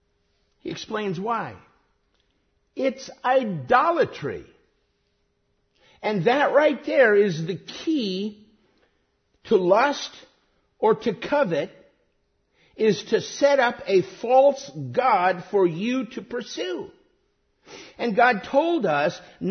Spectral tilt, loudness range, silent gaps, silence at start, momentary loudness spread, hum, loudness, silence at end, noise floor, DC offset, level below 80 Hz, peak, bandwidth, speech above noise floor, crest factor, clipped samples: -5.5 dB/octave; 4 LU; none; 0.65 s; 14 LU; none; -23 LUFS; 0 s; -70 dBFS; under 0.1%; -66 dBFS; -4 dBFS; 6.6 kHz; 48 dB; 20 dB; under 0.1%